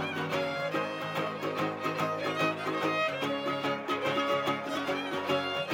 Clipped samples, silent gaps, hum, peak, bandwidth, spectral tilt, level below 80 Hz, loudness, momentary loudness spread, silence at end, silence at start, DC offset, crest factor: under 0.1%; none; none; -16 dBFS; 17 kHz; -5 dB/octave; -76 dBFS; -31 LUFS; 4 LU; 0 s; 0 s; under 0.1%; 16 dB